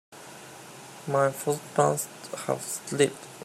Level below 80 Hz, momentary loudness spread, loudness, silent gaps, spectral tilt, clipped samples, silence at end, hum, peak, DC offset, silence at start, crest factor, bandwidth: -74 dBFS; 19 LU; -28 LUFS; none; -4 dB/octave; under 0.1%; 0 s; none; -8 dBFS; under 0.1%; 0.1 s; 22 dB; 16 kHz